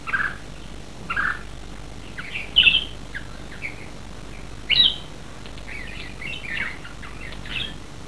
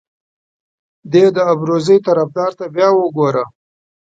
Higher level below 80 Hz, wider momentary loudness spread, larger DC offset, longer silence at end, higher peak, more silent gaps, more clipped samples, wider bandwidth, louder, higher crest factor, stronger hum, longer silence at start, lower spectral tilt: first, -42 dBFS vs -64 dBFS; first, 23 LU vs 8 LU; first, 1% vs under 0.1%; second, 0 s vs 0.65 s; second, -4 dBFS vs 0 dBFS; neither; neither; first, 11 kHz vs 7.8 kHz; second, -22 LUFS vs -14 LUFS; first, 24 dB vs 16 dB; neither; second, 0 s vs 1.05 s; second, -2.5 dB/octave vs -7 dB/octave